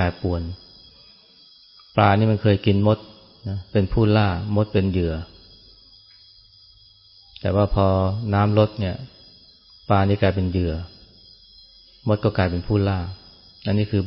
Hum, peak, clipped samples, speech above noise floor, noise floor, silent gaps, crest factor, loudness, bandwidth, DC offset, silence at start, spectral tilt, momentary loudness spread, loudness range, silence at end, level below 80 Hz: none; -2 dBFS; under 0.1%; 32 dB; -52 dBFS; none; 20 dB; -21 LUFS; 5.8 kHz; under 0.1%; 0 s; -12 dB/octave; 16 LU; 5 LU; 0 s; -40 dBFS